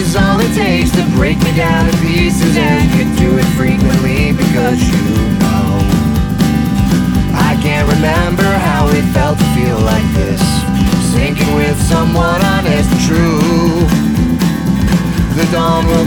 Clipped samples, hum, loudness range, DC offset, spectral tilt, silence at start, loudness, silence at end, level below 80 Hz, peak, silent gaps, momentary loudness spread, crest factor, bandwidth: under 0.1%; none; 1 LU; under 0.1%; -6 dB/octave; 0 s; -12 LUFS; 0 s; -22 dBFS; 0 dBFS; none; 2 LU; 10 dB; over 20 kHz